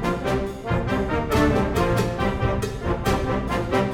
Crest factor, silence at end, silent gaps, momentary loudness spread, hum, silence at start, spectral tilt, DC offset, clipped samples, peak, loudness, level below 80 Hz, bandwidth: 16 dB; 0 s; none; 6 LU; none; 0 s; -6.5 dB/octave; under 0.1%; under 0.1%; -6 dBFS; -23 LUFS; -32 dBFS; 17.5 kHz